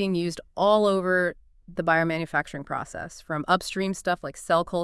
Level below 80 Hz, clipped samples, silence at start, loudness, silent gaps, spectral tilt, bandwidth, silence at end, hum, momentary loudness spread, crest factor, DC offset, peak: -54 dBFS; under 0.1%; 0 s; -25 LUFS; none; -5 dB/octave; 12 kHz; 0 s; none; 11 LU; 18 dB; under 0.1%; -8 dBFS